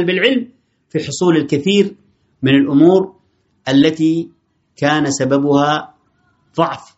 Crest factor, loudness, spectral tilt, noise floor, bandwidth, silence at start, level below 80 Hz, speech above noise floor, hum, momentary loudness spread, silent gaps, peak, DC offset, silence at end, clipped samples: 16 dB; -15 LUFS; -4.5 dB/octave; -59 dBFS; 8 kHz; 0 s; -58 dBFS; 45 dB; none; 13 LU; none; 0 dBFS; under 0.1%; 0.2 s; under 0.1%